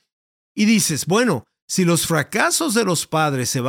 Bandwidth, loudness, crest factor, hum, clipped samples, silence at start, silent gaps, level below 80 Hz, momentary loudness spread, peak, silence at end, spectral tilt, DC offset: 18 kHz; -18 LUFS; 16 dB; none; under 0.1%; 0.55 s; 1.62-1.68 s; -58 dBFS; 5 LU; -2 dBFS; 0 s; -4 dB/octave; under 0.1%